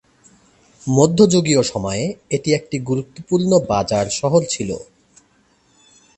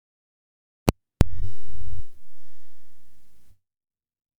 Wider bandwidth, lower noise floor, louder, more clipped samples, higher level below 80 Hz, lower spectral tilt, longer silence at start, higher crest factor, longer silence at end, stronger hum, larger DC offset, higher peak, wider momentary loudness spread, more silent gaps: second, 8.8 kHz vs over 20 kHz; first, -58 dBFS vs -45 dBFS; first, -18 LUFS vs -29 LUFS; neither; second, -48 dBFS vs -34 dBFS; about the same, -5.5 dB/octave vs -6.5 dB/octave; about the same, 0.85 s vs 0.85 s; about the same, 18 dB vs 20 dB; first, 1.35 s vs 0 s; neither; neither; about the same, 0 dBFS vs 0 dBFS; second, 11 LU vs 17 LU; neither